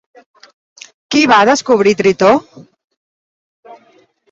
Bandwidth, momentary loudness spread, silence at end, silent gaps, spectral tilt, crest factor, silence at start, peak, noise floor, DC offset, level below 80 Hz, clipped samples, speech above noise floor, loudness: 7.8 kHz; 6 LU; 0.55 s; 2.84-2.88 s, 2.97-3.63 s; -4 dB/octave; 16 dB; 1.1 s; 0 dBFS; -51 dBFS; under 0.1%; -56 dBFS; under 0.1%; 41 dB; -11 LUFS